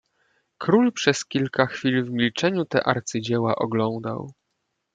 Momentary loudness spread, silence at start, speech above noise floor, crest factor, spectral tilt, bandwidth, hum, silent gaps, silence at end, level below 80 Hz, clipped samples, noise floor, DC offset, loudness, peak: 10 LU; 0.6 s; 54 dB; 22 dB; -5 dB/octave; 9.2 kHz; none; none; 0.65 s; -66 dBFS; under 0.1%; -77 dBFS; under 0.1%; -23 LUFS; -2 dBFS